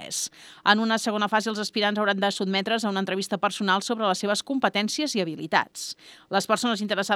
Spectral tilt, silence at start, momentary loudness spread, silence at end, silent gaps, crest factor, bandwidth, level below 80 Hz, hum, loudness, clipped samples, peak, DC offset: -3.5 dB/octave; 0 s; 6 LU; 0 s; none; 24 dB; 16 kHz; -78 dBFS; none; -25 LUFS; under 0.1%; -2 dBFS; under 0.1%